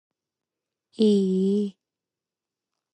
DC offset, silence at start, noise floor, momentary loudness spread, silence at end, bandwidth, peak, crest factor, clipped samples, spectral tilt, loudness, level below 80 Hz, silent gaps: under 0.1%; 1 s; -89 dBFS; 7 LU; 1.2 s; 8.8 kHz; -10 dBFS; 16 dB; under 0.1%; -8 dB/octave; -23 LUFS; -76 dBFS; none